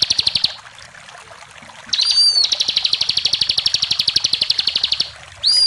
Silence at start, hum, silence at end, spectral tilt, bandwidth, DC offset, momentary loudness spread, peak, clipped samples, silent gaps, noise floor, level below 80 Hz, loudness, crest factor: 0 s; none; 0 s; 1 dB/octave; 14.5 kHz; under 0.1%; 8 LU; -2 dBFS; under 0.1%; none; -39 dBFS; -52 dBFS; -15 LUFS; 18 dB